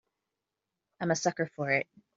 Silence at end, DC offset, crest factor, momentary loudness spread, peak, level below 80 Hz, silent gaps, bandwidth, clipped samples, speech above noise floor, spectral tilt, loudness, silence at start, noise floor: 0.35 s; under 0.1%; 22 dB; 5 LU; -12 dBFS; -76 dBFS; none; 7.8 kHz; under 0.1%; 56 dB; -4.5 dB/octave; -31 LUFS; 1 s; -88 dBFS